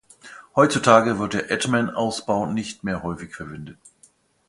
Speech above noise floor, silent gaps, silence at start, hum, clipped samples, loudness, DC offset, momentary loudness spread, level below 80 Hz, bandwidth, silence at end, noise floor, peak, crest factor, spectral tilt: 36 dB; none; 0.25 s; none; under 0.1%; -21 LUFS; under 0.1%; 19 LU; -54 dBFS; 11.5 kHz; 0.75 s; -58 dBFS; 0 dBFS; 22 dB; -5 dB/octave